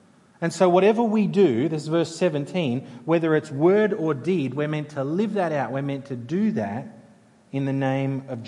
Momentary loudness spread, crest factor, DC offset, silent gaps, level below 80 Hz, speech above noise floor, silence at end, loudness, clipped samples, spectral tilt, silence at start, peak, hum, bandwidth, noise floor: 10 LU; 18 dB; under 0.1%; none; -74 dBFS; 31 dB; 0 s; -23 LUFS; under 0.1%; -7 dB/octave; 0.4 s; -4 dBFS; none; 11 kHz; -53 dBFS